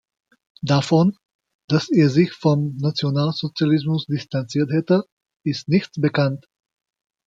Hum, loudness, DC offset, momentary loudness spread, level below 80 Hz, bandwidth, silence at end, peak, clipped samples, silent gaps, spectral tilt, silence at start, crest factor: none; -20 LUFS; under 0.1%; 9 LU; -60 dBFS; 7.8 kHz; 0.9 s; -4 dBFS; under 0.1%; 1.35-1.39 s, 1.55-1.68 s, 5.12-5.17 s; -7 dB/octave; 0.65 s; 16 dB